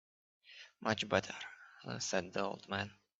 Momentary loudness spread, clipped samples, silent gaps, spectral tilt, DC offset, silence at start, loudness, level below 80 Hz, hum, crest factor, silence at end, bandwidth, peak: 19 LU; under 0.1%; none; -3.5 dB/octave; under 0.1%; 0.45 s; -38 LUFS; -78 dBFS; none; 26 dB; 0.25 s; 8.2 kHz; -16 dBFS